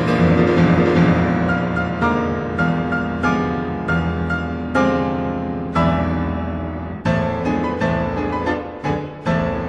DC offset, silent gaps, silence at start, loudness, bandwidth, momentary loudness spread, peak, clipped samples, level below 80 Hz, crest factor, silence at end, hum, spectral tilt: under 0.1%; none; 0 s; -19 LUFS; 8 kHz; 9 LU; -2 dBFS; under 0.1%; -36 dBFS; 16 dB; 0 s; none; -8 dB/octave